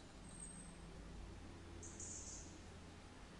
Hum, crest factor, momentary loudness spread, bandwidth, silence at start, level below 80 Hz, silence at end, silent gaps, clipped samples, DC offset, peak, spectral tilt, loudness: none; 16 dB; 8 LU; 11 kHz; 0 s; -60 dBFS; 0 s; none; under 0.1%; under 0.1%; -40 dBFS; -3.5 dB/octave; -54 LUFS